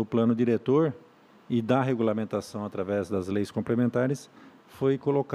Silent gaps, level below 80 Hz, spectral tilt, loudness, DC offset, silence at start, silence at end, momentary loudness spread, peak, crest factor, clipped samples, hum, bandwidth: none; -68 dBFS; -8 dB/octave; -27 LUFS; under 0.1%; 0 s; 0 s; 8 LU; -10 dBFS; 16 dB; under 0.1%; none; 12.5 kHz